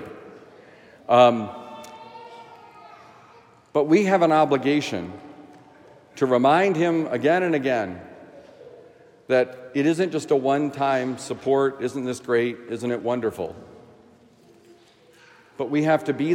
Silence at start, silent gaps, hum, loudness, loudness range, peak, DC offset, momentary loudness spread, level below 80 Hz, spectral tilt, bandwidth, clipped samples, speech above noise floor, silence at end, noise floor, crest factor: 0 s; none; none; -22 LUFS; 6 LU; -4 dBFS; under 0.1%; 23 LU; -72 dBFS; -6 dB/octave; 15.5 kHz; under 0.1%; 33 dB; 0 s; -54 dBFS; 20 dB